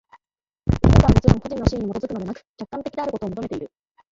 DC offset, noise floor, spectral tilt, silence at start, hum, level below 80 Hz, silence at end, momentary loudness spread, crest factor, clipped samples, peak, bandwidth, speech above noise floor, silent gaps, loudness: under 0.1%; under -90 dBFS; -8 dB/octave; 0.65 s; none; -28 dBFS; 0.45 s; 18 LU; 20 dB; under 0.1%; 0 dBFS; 7.8 kHz; over 68 dB; 2.49-2.54 s; -21 LUFS